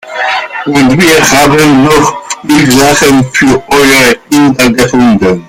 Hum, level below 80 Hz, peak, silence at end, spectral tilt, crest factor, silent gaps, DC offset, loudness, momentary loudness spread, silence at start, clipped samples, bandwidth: none; -32 dBFS; 0 dBFS; 0.05 s; -4 dB/octave; 6 dB; none; under 0.1%; -6 LUFS; 7 LU; 0.05 s; 0.8%; 17.5 kHz